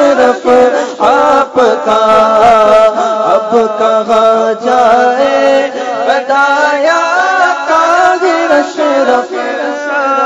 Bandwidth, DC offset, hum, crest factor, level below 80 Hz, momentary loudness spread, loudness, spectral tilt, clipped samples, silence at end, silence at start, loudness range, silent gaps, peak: 10 kHz; under 0.1%; none; 8 dB; -50 dBFS; 5 LU; -9 LUFS; -3.5 dB/octave; 2%; 0 s; 0 s; 2 LU; none; 0 dBFS